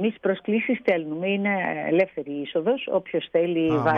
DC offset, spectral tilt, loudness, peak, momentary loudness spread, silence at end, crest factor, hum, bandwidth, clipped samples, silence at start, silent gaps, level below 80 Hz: under 0.1%; -8.5 dB/octave; -24 LUFS; -8 dBFS; 4 LU; 0 s; 14 dB; none; 6.4 kHz; under 0.1%; 0 s; none; -64 dBFS